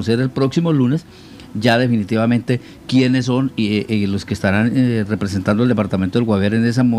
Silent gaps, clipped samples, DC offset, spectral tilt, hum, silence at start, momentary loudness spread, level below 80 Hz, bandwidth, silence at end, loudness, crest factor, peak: none; under 0.1%; under 0.1%; -7 dB/octave; none; 0 s; 4 LU; -50 dBFS; 12 kHz; 0 s; -17 LUFS; 16 dB; 0 dBFS